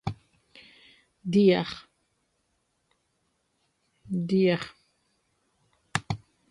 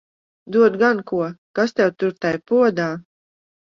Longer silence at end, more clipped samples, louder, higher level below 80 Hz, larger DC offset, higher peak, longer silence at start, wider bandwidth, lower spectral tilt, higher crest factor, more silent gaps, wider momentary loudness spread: second, 0.35 s vs 0.7 s; neither; second, -27 LUFS vs -19 LUFS; about the same, -60 dBFS vs -64 dBFS; neither; about the same, -6 dBFS vs -4 dBFS; second, 0.05 s vs 0.5 s; first, 11.5 kHz vs 7.2 kHz; about the same, -6.5 dB/octave vs -6.5 dB/octave; first, 24 dB vs 16 dB; second, none vs 1.38-1.54 s; first, 19 LU vs 9 LU